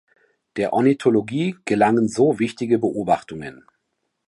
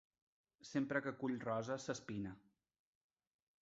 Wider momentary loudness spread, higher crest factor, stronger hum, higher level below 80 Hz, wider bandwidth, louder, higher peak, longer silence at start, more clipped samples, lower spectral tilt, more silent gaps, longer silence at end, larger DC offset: first, 15 LU vs 11 LU; second, 16 dB vs 22 dB; neither; first, -58 dBFS vs -76 dBFS; first, 11.5 kHz vs 7.6 kHz; first, -20 LUFS vs -43 LUFS; first, -4 dBFS vs -24 dBFS; about the same, 0.55 s vs 0.65 s; neither; about the same, -6.5 dB/octave vs -5.5 dB/octave; neither; second, 0.75 s vs 1.2 s; neither